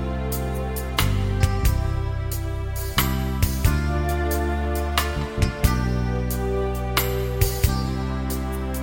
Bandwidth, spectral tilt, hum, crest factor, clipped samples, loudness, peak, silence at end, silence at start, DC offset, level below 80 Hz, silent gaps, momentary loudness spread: 17 kHz; -5.5 dB/octave; none; 22 dB; under 0.1%; -24 LUFS; -2 dBFS; 0 s; 0 s; under 0.1%; -26 dBFS; none; 5 LU